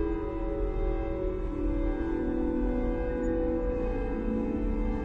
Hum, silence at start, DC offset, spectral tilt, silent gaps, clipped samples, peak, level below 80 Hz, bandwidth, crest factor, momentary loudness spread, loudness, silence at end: none; 0 s; under 0.1%; -9.5 dB/octave; none; under 0.1%; -18 dBFS; -32 dBFS; 4 kHz; 12 dB; 3 LU; -31 LUFS; 0 s